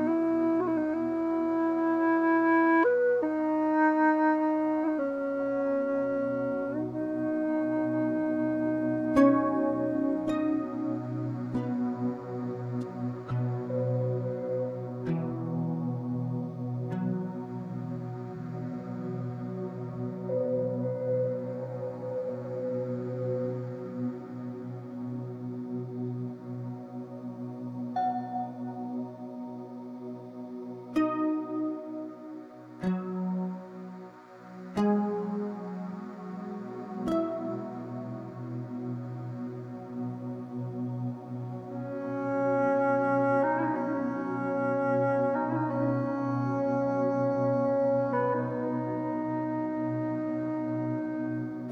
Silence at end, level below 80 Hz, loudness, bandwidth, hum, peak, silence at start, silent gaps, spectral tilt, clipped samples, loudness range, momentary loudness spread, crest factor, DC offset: 0 s; -66 dBFS; -30 LUFS; 7.2 kHz; none; -10 dBFS; 0 s; none; -9.5 dB/octave; under 0.1%; 10 LU; 13 LU; 20 dB; under 0.1%